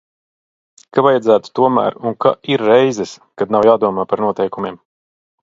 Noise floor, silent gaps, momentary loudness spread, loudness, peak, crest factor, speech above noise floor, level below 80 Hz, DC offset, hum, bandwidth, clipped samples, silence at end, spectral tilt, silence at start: under -90 dBFS; none; 12 LU; -15 LUFS; 0 dBFS; 16 dB; over 75 dB; -60 dBFS; under 0.1%; none; 7.8 kHz; under 0.1%; 0.7 s; -6 dB/octave; 0.95 s